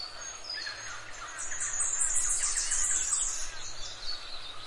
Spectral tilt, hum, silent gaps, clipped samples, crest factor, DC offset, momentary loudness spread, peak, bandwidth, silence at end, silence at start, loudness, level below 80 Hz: 1.5 dB/octave; none; none; under 0.1%; 18 dB; under 0.1%; 13 LU; -14 dBFS; 11.5 kHz; 0 s; 0 s; -30 LUFS; -46 dBFS